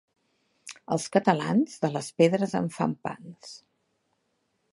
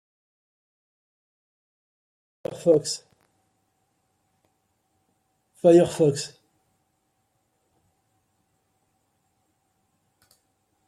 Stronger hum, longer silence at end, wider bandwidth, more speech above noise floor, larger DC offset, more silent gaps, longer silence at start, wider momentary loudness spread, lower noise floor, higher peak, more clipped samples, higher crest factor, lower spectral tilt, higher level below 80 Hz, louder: neither; second, 1.2 s vs 4.6 s; second, 11.5 kHz vs 13 kHz; second, 49 dB vs 53 dB; neither; neither; second, 0.65 s vs 2.5 s; about the same, 21 LU vs 20 LU; about the same, -75 dBFS vs -73 dBFS; about the same, -6 dBFS vs -6 dBFS; neither; about the same, 22 dB vs 24 dB; about the same, -6 dB/octave vs -6 dB/octave; about the same, -70 dBFS vs -70 dBFS; second, -26 LUFS vs -21 LUFS